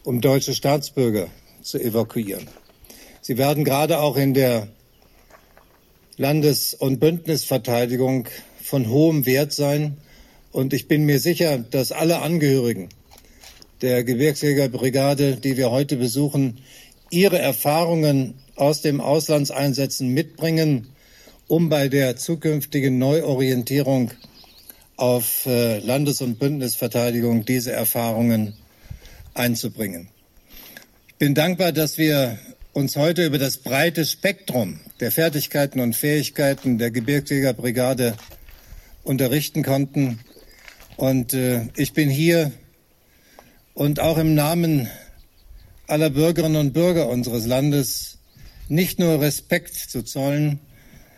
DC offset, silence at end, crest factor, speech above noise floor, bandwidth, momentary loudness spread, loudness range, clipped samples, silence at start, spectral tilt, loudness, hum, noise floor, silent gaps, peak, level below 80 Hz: under 0.1%; 0.6 s; 18 dB; 37 dB; 16 kHz; 9 LU; 3 LU; under 0.1%; 0.05 s; -5.5 dB/octave; -21 LUFS; none; -57 dBFS; none; -4 dBFS; -50 dBFS